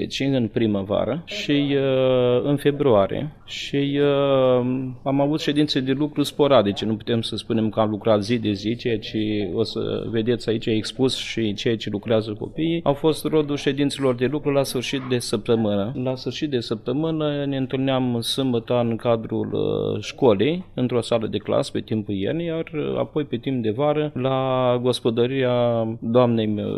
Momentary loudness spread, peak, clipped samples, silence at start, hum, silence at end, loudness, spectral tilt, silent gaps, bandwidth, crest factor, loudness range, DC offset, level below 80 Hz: 7 LU; -4 dBFS; under 0.1%; 0 s; none; 0 s; -22 LUFS; -6.5 dB/octave; none; 14 kHz; 18 dB; 3 LU; under 0.1%; -50 dBFS